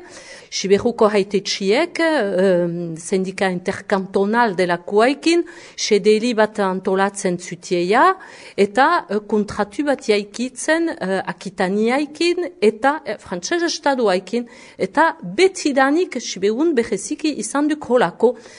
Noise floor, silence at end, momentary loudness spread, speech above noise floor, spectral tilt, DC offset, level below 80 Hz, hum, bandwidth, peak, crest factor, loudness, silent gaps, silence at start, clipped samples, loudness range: -40 dBFS; 0.05 s; 9 LU; 21 dB; -4.5 dB/octave; under 0.1%; -58 dBFS; none; 10.5 kHz; -2 dBFS; 18 dB; -19 LUFS; none; 0 s; under 0.1%; 2 LU